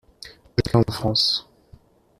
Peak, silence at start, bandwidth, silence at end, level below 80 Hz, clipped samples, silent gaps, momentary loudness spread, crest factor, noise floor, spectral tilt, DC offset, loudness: -4 dBFS; 0.25 s; 14 kHz; 0.8 s; -46 dBFS; under 0.1%; none; 19 LU; 22 dB; -52 dBFS; -5.5 dB/octave; under 0.1%; -21 LUFS